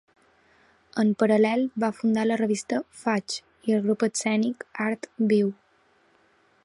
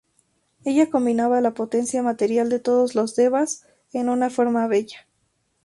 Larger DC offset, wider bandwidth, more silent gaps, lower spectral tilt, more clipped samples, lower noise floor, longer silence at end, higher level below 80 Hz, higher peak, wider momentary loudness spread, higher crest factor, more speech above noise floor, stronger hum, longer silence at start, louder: neither; about the same, 11.5 kHz vs 11.5 kHz; neither; about the same, -5 dB/octave vs -4.5 dB/octave; neither; second, -63 dBFS vs -69 dBFS; first, 1.1 s vs 0.65 s; about the same, -72 dBFS vs -68 dBFS; about the same, -8 dBFS vs -6 dBFS; about the same, 8 LU vs 7 LU; about the same, 18 dB vs 16 dB; second, 39 dB vs 49 dB; neither; first, 0.95 s vs 0.65 s; second, -25 LUFS vs -21 LUFS